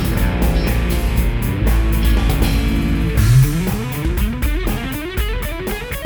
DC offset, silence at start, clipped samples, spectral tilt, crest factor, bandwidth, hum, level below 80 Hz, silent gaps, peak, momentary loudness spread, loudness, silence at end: under 0.1%; 0 s; under 0.1%; -6 dB/octave; 14 dB; over 20 kHz; none; -18 dBFS; none; -2 dBFS; 9 LU; -18 LUFS; 0 s